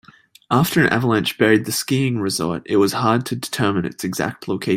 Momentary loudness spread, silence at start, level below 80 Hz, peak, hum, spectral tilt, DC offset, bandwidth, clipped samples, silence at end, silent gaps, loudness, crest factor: 8 LU; 0.5 s; -54 dBFS; -2 dBFS; none; -5 dB/octave; under 0.1%; 16.5 kHz; under 0.1%; 0 s; none; -19 LUFS; 18 dB